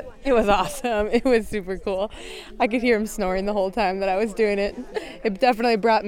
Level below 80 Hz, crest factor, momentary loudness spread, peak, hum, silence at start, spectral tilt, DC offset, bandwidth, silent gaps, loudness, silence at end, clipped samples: -40 dBFS; 18 dB; 9 LU; -4 dBFS; none; 0 s; -5 dB/octave; under 0.1%; 16.5 kHz; none; -23 LUFS; 0 s; under 0.1%